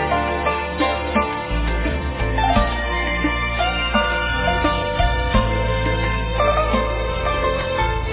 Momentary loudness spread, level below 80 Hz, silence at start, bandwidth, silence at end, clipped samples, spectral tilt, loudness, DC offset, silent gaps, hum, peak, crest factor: 4 LU; -26 dBFS; 0 s; 4 kHz; 0 s; under 0.1%; -9.5 dB/octave; -20 LUFS; under 0.1%; none; none; -4 dBFS; 16 dB